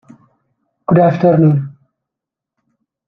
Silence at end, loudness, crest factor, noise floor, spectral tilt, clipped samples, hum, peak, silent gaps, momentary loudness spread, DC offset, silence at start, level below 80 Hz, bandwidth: 1.35 s; -12 LUFS; 14 dB; -83 dBFS; -11 dB/octave; under 0.1%; none; -2 dBFS; none; 16 LU; under 0.1%; 0.9 s; -56 dBFS; 5.2 kHz